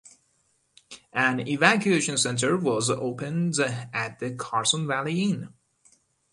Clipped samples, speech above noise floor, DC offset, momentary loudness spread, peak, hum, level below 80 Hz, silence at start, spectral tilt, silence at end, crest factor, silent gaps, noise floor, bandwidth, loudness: under 0.1%; 44 dB; under 0.1%; 10 LU; -2 dBFS; none; -66 dBFS; 0.05 s; -3.5 dB/octave; 0.85 s; 24 dB; none; -69 dBFS; 11.5 kHz; -25 LUFS